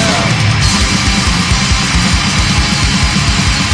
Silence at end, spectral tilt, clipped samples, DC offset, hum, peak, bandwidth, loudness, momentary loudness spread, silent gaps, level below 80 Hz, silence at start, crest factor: 0 s; -3.5 dB/octave; under 0.1%; under 0.1%; none; 0 dBFS; 10.5 kHz; -11 LUFS; 1 LU; none; -18 dBFS; 0 s; 12 dB